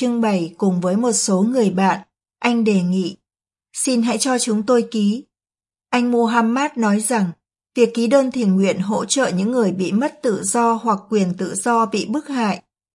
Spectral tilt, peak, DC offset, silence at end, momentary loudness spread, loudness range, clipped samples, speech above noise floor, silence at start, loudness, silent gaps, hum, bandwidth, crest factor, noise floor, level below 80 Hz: -5 dB/octave; -2 dBFS; under 0.1%; 0.35 s; 6 LU; 2 LU; under 0.1%; over 72 dB; 0 s; -19 LUFS; none; none; 11.5 kHz; 18 dB; under -90 dBFS; -68 dBFS